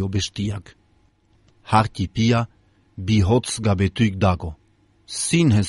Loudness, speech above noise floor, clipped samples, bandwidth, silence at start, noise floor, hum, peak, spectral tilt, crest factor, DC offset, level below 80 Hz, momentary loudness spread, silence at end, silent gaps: -21 LUFS; 40 dB; under 0.1%; 11.5 kHz; 0 s; -60 dBFS; none; -4 dBFS; -5.5 dB/octave; 18 dB; under 0.1%; -42 dBFS; 14 LU; 0 s; none